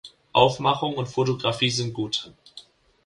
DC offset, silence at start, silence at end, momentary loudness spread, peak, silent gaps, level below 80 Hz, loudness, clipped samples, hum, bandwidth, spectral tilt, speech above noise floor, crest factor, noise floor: under 0.1%; 0.05 s; 0.45 s; 8 LU; -4 dBFS; none; -56 dBFS; -23 LUFS; under 0.1%; none; 11.5 kHz; -4.5 dB/octave; 26 dB; 22 dB; -50 dBFS